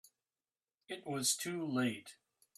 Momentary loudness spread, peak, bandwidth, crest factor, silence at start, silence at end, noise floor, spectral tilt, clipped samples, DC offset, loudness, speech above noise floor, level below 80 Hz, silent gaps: 15 LU; -20 dBFS; 15.5 kHz; 22 dB; 0.9 s; 0.45 s; under -90 dBFS; -3 dB/octave; under 0.1%; under 0.1%; -37 LUFS; over 52 dB; -86 dBFS; none